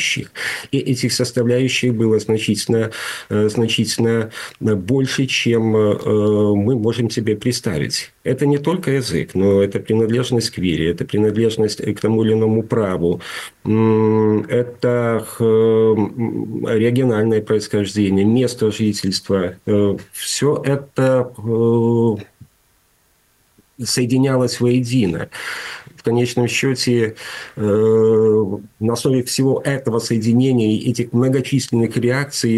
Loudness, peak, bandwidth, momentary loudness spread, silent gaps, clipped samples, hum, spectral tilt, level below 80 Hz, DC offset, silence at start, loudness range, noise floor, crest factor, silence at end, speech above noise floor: -18 LUFS; -6 dBFS; 12.5 kHz; 7 LU; none; under 0.1%; none; -5.5 dB/octave; -52 dBFS; under 0.1%; 0 s; 3 LU; -59 dBFS; 12 dB; 0 s; 42 dB